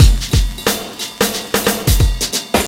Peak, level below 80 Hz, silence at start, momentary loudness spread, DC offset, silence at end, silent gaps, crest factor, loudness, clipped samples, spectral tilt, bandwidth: 0 dBFS; -18 dBFS; 0 s; 4 LU; under 0.1%; 0 s; none; 14 dB; -16 LUFS; 0.1%; -4 dB/octave; 17 kHz